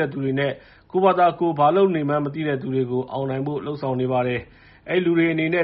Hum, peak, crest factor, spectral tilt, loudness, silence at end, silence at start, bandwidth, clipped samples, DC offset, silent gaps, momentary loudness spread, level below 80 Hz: none; -4 dBFS; 16 dB; -5.5 dB/octave; -22 LUFS; 0 s; 0 s; 5.2 kHz; under 0.1%; under 0.1%; none; 9 LU; -58 dBFS